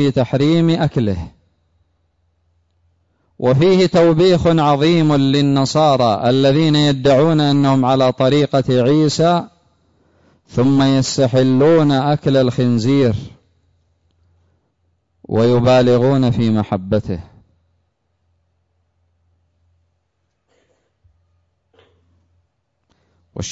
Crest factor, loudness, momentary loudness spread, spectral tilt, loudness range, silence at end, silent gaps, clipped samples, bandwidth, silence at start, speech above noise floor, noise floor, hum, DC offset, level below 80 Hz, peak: 12 dB; -14 LUFS; 8 LU; -7 dB/octave; 7 LU; 0 s; none; under 0.1%; 8 kHz; 0 s; 56 dB; -69 dBFS; none; under 0.1%; -46 dBFS; -4 dBFS